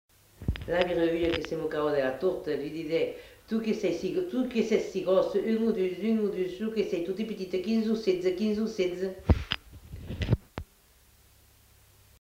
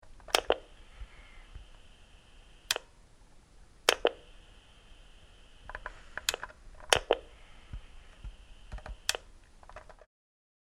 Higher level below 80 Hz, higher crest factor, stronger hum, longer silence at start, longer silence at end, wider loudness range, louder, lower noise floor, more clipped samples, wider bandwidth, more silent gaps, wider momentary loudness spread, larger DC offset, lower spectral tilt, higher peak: first, -44 dBFS vs -52 dBFS; second, 20 dB vs 36 dB; neither; first, 0.4 s vs 0.05 s; first, 1.55 s vs 0.7 s; second, 3 LU vs 6 LU; first, -29 LUFS vs -32 LUFS; first, -61 dBFS vs -57 dBFS; neither; first, 16 kHz vs 14.5 kHz; neither; second, 8 LU vs 25 LU; neither; first, -6.5 dB/octave vs -1 dB/octave; second, -8 dBFS vs -2 dBFS